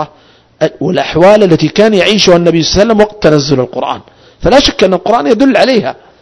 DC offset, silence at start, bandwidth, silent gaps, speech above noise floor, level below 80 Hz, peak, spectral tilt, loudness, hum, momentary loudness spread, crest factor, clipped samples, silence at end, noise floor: under 0.1%; 0 s; 11 kHz; none; 35 dB; -32 dBFS; 0 dBFS; -5 dB/octave; -8 LUFS; none; 10 LU; 8 dB; 4%; 0.3 s; -43 dBFS